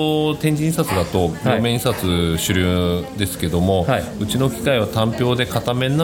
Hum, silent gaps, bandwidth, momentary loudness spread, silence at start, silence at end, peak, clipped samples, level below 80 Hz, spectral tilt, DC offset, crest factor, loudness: none; none; 18 kHz; 3 LU; 0 s; 0 s; -4 dBFS; under 0.1%; -38 dBFS; -5.5 dB/octave; under 0.1%; 16 dB; -19 LUFS